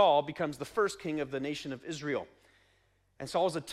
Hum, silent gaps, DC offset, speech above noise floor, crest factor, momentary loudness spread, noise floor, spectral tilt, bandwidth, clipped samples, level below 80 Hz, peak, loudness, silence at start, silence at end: none; none; under 0.1%; 39 dB; 20 dB; 9 LU; -70 dBFS; -4.5 dB/octave; 15 kHz; under 0.1%; -68 dBFS; -12 dBFS; -33 LUFS; 0 s; 0 s